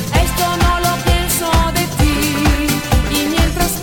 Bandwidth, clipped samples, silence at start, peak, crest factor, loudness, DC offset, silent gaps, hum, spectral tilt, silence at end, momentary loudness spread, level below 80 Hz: 19.5 kHz; under 0.1%; 0 s; -2 dBFS; 12 dB; -15 LUFS; under 0.1%; none; none; -4 dB/octave; 0 s; 1 LU; -20 dBFS